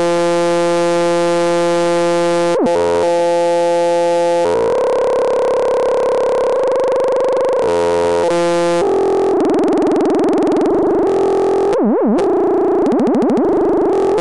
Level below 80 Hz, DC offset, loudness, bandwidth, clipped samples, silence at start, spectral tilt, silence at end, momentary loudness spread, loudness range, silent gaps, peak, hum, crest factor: -48 dBFS; 0.9%; -14 LUFS; 11.5 kHz; under 0.1%; 0 s; -5.5 dB/octave; 0 s; 1 LU; 1 LU; none; -6 dBFS; none; 8 dB